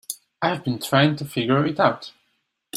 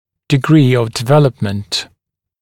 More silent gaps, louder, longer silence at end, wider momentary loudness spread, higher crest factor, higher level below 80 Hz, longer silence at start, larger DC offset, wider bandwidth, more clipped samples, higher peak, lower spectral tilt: neither; second, -21 LUFS vs -14 LUFS; second, 0 s vs 0.55 s; first, 15 LU vs 10 LU; first, 20 dB vs 14 dB; second, -62 dBFS vs -50 dBFS; second, 0.1 s vs 0.3 s; neither; about the same, 16 kHz vs 15.5 kHz; neither; about the same, -2 dBFS vs 0 dBFS; about the same, -5.5 dB/octave vs -6.5 dB/octave